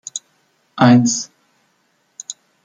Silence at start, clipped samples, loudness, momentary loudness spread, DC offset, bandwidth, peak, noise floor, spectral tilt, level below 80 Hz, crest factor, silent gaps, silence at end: 0.15 s; under 0.1%; -14 LUFS; 22 LU; under 0.1%; 9.4 kHz; -2 dBFS; -63 dBFS; -5 dB/octave; -64 dBFS; 18 dB; none; 0.35 s